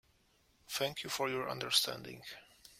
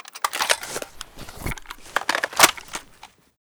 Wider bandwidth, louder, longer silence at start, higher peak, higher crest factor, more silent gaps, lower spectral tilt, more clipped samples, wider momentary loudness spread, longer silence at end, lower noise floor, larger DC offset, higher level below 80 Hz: second, 16.5 kHz vs over 20 kHz; second, -35 LUFS vs -21 LUFS; first, 0.7 s vs 0.15 s; second, -14 dBFS vs 0 dBFS; about the same, 24 dB vs 26 dB; neither; first, -2 dB/octave vs -0.5 dB/octave; neither; about the same, 18 LU vs 20 LU; second, 0.05 s vs 0.35 s; first, -72 dBFS vs -50 dBFS; neither; second, -74 dBFS vs -46 dBFS